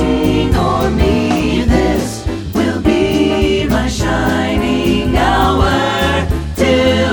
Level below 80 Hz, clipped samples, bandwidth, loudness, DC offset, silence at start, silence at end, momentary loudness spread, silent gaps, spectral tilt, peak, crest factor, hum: -22 dBFS; under 0.1%; over 20 kHz; -14 LUFS; under 0.1%; 0 s; 0 s; 5 LU; none; -6 dB/octave; 0 dBFS; 12 dB; none